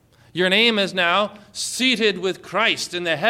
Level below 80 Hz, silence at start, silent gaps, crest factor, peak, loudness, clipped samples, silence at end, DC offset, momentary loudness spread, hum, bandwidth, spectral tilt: -64 dBFS; 0.35 s; none; 16 dB; -4 dBFS; -19 LUFS; under 0.1%; 0 s; under 0.1%; 11 LU; none; 16.5 kHz; -3 dB/octave